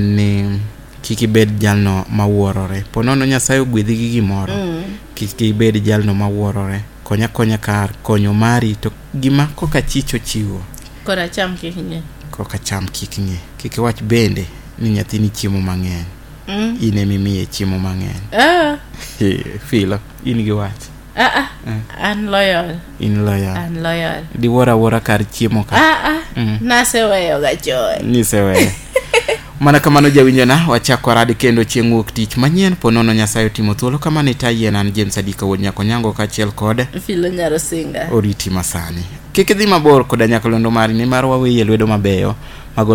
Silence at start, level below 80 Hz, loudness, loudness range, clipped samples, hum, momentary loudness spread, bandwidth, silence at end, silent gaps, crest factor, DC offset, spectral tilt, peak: 0 s; -34 dBFS; -15 LUFS; 7 LU; under 0.1%; none; 12 LU; 18 kHz; 0 s; none; 14 dB; under 0.1%; -5.5 dB/octave; 0 dBFS